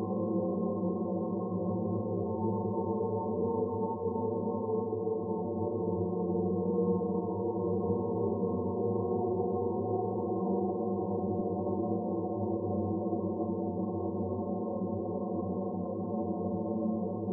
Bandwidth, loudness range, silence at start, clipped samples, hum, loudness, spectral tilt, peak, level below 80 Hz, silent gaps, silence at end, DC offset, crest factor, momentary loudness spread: 1.3 kHz; 2 LU; 0 s; under 0.1%; none; -33 LUFS; -15 dB/octave; -20 dBFS; -72 dBFS; none; 0 s; under 0.1%; 12 dB; 3 LU